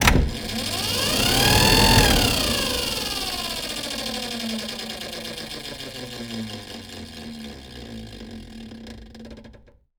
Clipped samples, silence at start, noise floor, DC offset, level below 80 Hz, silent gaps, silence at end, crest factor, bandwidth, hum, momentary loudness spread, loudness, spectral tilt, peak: under 0.1%; 0 s; -50 dBFS; under 0.1%; -32 dBFS; none; 0.45 s; 24 dB; over 20 kHz; none; 23 LU; -21 LUFS; -3 dB/octave; 0 dBFS